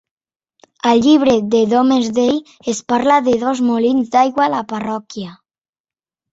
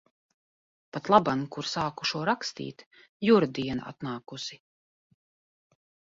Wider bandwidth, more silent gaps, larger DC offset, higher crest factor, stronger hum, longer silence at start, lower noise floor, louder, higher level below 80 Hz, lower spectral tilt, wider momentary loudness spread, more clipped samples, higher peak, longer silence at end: about the same, 8 kHz vs 7.8 kHz; second, none vs 2.86-2.91 s, 3.09-3.20 s; neither; second, 14 dB vs 26 dB; neither; about the same, 0.85 s vs 0.95 s; about the same, under -90 dBFS vs under -90 dBFS; first, -15 LUFS vs -28 LUFS; first, -56 dBFS vs -64 dBFS; about the same, -5 dB/octave vs -5 dB/octave; second, 12 LU vs 16 LU; neither; about the same, -2 dBFS vs -4 dBFS; second, 1 s vs 1.55 s